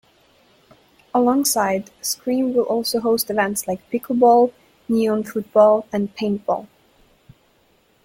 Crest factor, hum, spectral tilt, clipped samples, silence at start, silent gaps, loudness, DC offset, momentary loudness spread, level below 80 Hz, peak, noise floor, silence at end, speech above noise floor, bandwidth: 18 dB; none; -4 dB/octave; under 0.1%; 1.15 s; none; -19 LUFS; under 0.1%; 10 LU; -60 dBFS; -2 dBFS; -59 dBFS; 1.4 s; 41 dB; 16.5 kHz